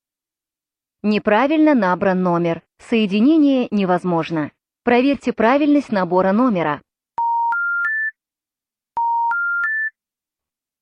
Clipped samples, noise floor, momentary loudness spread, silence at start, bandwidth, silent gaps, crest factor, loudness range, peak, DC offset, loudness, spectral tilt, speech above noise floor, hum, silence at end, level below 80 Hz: under 0.1%; -89 dBFS; 11 LU; 1.05 s; 8.8 kHz; none; 16 dB; 4 LU; -4 dBFS; under 0.1%; -18 LUFS; -7.5 dB/octave; 73 dB; none; 0.9 s; -60 dBFS